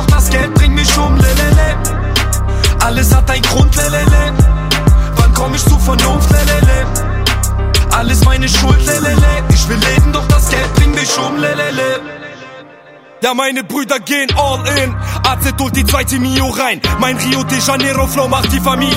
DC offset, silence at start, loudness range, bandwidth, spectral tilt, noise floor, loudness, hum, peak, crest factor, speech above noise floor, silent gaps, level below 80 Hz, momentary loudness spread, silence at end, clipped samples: under 0.1%; 0 s; 4 LU; 16.5 kHz; -4.5 dB/octave; -38 dBFS; -12 LUFS; none; 0 dBFS; 10 dB; 24 dB; none; -14 dBFS; 5 LU; 0 s; under 0.1%